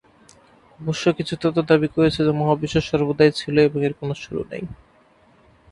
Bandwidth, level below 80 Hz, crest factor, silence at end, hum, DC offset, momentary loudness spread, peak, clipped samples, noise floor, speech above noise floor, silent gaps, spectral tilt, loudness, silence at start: 11 kHz; -48 dBFS; 20 dB; 0.95 s; none; under 0.1%; 12 LU; -2 dBFS; under 0.1%; -55 dBFS; 35 dB; none; -6.5 dB/octave; -20 LUFS; 0.8 s